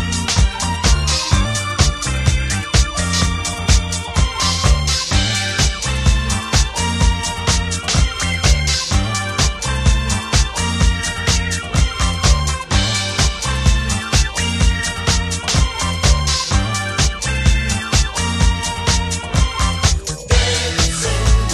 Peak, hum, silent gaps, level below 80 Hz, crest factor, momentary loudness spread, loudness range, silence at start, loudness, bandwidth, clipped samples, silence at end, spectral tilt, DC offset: 0 dBFS; none; none; -20 dBFS; 16 dB; 3 LU; 1 LU; 0 s; -17 LUFS; 14 kHz; under 0.1%; 0 s; -3.5 dB/octave; under 0.1%